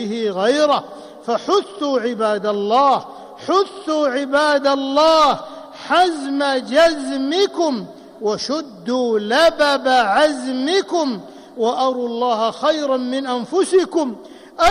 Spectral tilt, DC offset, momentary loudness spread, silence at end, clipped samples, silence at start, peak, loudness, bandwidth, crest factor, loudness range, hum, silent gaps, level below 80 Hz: -3.5 dB/octave; under 0.1%; 11 LU; 0 s; under 0.1%; 0 s; -6 dBFS; -18 LUFS; 14.5 kHz; 12 dB; 3 LU; none; none; -56 dBFS